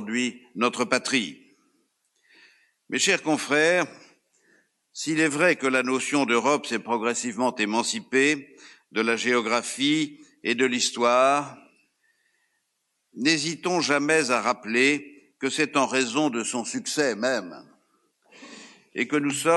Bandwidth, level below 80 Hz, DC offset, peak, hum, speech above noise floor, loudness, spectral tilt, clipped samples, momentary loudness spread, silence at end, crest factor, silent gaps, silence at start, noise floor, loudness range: 12 kHz; -78 dBFS; under 0.1%; -4 dBFS; none; 52 dB; -24 LUFS; -3 dB/octave; under 0.1%; 9 LU; 0 s; 20 dB; none; 0 s; -76 dBFS; 3 LU